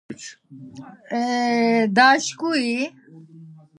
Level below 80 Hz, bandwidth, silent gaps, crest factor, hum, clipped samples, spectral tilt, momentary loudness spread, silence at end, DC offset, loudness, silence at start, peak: -74 dBFS; 11 kHz; none; 20 dB; none; under 0.1%; -3.5 dB/octave; 24 LU; 0.25 s; under 0.1%; -20 LUFS; 0.1 s; -2 dBFS